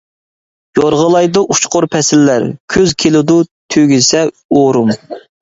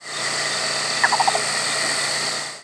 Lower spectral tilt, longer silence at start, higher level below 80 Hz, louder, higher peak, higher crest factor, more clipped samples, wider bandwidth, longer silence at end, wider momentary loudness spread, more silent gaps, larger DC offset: first, -4.5 dB/octave vs 0 dB/octave; first, 0.75 s vs 0 s; first, -46 dBFS vs -70 dBFS; first, -11 LUFS vs -20 LUFS; about the same, 0 dBFS vs -2 dBFS; second, 12 dB vs 20 dB; neither; second, 8 kHz vs 11 kHz; first, 0.25 s vs 0 s; about the same, 6 LU vs 5 LU; first, 2.60-2.68 s, 3.51-3.69 s, 4.45-4.49 s vs none; neither